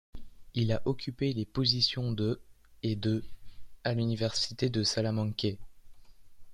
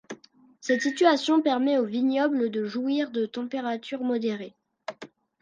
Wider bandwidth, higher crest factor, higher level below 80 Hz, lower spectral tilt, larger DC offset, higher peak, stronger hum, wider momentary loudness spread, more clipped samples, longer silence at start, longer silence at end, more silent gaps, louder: first, 11.5 kHz vs 9.6 kHz; about the same, 20 dB vs 20 dB; first, -54 dBFS vs -80 dBFS; about the same, -5.5 dB/octave vs -4.5 dB/octave; neither; second, -12 dBFS vs -8 dBFS; neither; second, 8 LU vs 19 LU; neither; about the same, 0.15 s vs 0.1 s; second, 0 s vs 0.35 s; neither; second, -31 LUFS vs -26 LUFS